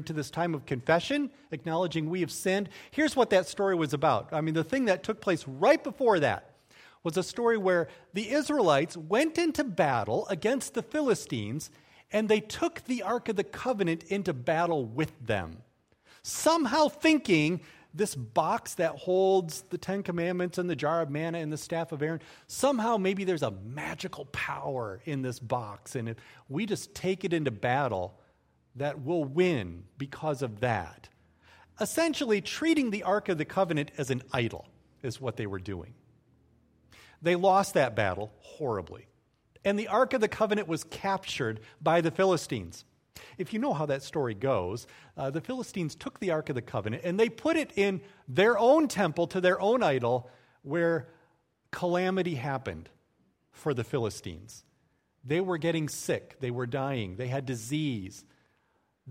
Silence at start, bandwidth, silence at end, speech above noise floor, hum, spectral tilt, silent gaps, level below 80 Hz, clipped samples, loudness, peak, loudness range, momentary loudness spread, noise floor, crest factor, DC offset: 0 s; 16 kHz; 0 s; 44 dB; none; -5.5 dB/octave; none; -64 dBFS; under 0.1%; -29 LUFS; -10 dBFS; 6 LU; 12 LU; -73 dBFS; 20 dB; under 0.1%